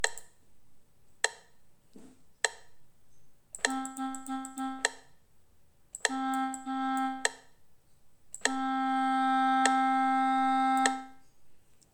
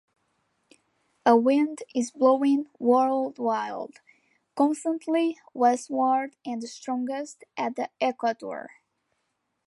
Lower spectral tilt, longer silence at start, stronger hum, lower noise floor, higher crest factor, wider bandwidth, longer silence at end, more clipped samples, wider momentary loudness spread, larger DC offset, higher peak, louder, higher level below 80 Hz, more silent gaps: second, -0.5 dB/octave vs -4.5 dB/octave; second, 0 s vs 1.25 s; neither; second, -65 dBFS vs -77 dBFS; first, 26 dB vs 20 dB; first, 19 kHz vs 11.5 kHz; second, 0.2 s vs 1 s; neither; about the same, 12 LU vs 14 LU; neither; about the same, -6 dBFS vs -6 dBFS; second, -30 LUFS vs -26 LUFS; first, -72 dBFS vs -82 dBFS; neither